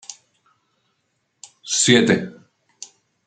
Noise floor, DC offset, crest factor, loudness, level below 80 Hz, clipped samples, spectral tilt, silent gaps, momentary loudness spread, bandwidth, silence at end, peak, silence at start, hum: -71 dBFS; under 0.1%; 22 dB; -17 LUFS; -64 dBFS; under 0.1%; -3 dB/octave; none; 26 LU; 9.4 kHz; 0.95 s; -2 dBFS; 0.1 s; none